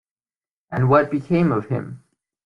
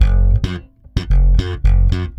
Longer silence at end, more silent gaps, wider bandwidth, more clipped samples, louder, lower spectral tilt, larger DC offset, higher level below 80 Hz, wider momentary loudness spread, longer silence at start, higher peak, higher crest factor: first, 0.5 s vs 0.05 s; neither; about the same, 5.8 kHz vs 6 kHz; neither; second, -20 LUFS vs -17 LUFS; first, -9.5 dB/octave vs -7.5 dB/octave; neither; second, -56 dBFS vs -14 dBFS; about the same, 12 LU vs 10 LU; first, 0.7 s vs 0 s; second, -4 dBFS vs 0 dBFS; about the same, 18 dB vs 14 dB